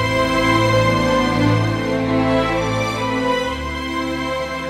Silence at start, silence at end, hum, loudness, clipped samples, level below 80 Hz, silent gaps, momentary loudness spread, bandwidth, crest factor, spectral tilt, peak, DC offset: 0 s; 0 s; none; -18 LUFS; under 0.1%; -36 dBFS; none; 7 LU; 15.5 kHz; 14 dB; -5.5 dB/octave; -4 dBFS; under 0.1%